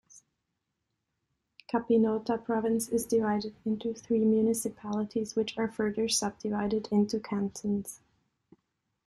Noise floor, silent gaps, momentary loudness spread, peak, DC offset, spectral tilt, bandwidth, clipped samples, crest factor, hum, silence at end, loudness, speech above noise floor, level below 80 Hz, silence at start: -83 dBFS; none; 8 LU; -16 dBFS; under 0.1%; -5 dB/octave; 13.5 kHz; under 0.1%; 16 dB; none; 1.1 s; -30 LUFS; 54 dB; -64 dBFS; 0.15 s